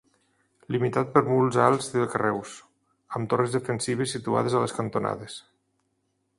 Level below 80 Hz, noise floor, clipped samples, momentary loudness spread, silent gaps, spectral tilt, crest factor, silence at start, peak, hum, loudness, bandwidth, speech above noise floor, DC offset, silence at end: -64 dBFS; -74 dBFS; under 0.1%; 14 LU; none; -5.5 dB/octave; 24 dB; 0.7 s; -4 dBFS; none; -26 LUFS; 11.5 kHz; 49 dB; under 0.1%; 1 s